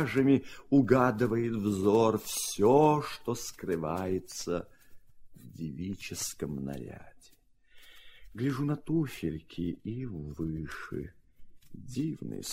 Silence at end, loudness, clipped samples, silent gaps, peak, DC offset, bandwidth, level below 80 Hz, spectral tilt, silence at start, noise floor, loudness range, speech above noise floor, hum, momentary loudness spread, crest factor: 0 s; -31 LUFS; under 0.1%; none; -10 dBFS; under 0.1%; 16 kHz; -56 dBFS; -6 dB/octave; 0 s; -62 dBFS; 12 LU; 32 dB; none; 16 LU; 22 dB